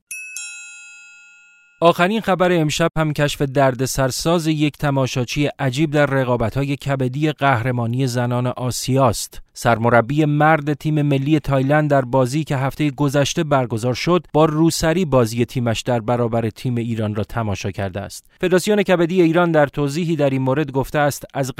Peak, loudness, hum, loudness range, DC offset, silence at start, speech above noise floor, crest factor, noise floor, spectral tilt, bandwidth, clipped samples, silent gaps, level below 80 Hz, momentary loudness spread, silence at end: 0 dBFS; -18 LUFS; none; 3 LU; under 0.1%; 0.1 s; 32 dB; 18 dB; -50 dBFS; -6 dB/octave; 16 kHz; under 0.1%; none; -42 dBFS; 8 LU; 0.05 s